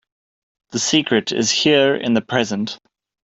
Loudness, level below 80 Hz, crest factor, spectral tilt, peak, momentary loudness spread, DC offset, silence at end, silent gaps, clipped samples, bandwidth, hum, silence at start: -18 LUFS; -58 dBFS; 18 dB; -3 dB/octave; -2 dBFS; 13 LU; under 0.1%; 0.5 s; none; under 0.1%; 8.2 kHz; none; 0.7 s